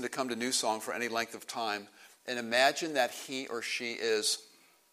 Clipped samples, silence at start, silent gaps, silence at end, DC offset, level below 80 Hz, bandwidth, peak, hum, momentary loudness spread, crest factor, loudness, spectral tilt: under 0.1%; 0 s; none; 0.45 s; under 0.1%; -82 dBFS; 15.5 kHz; -10 dBFS; none; 11 LU; 24 dB; -32 LUFS; -1.5 dB/octave